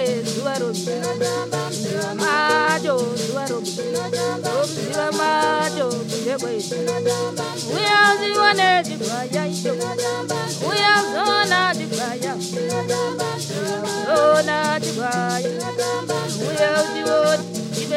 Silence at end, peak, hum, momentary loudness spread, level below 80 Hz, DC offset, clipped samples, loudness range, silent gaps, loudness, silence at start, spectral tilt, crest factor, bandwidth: 0 s; 0 dBFS; none; 9 LU; -68 dBFS; under 0.1%; under 0.1%; 3 LU; none; -20 LUFS; 0 s; -3.5 dB/octave; 20 dB; 16 kHz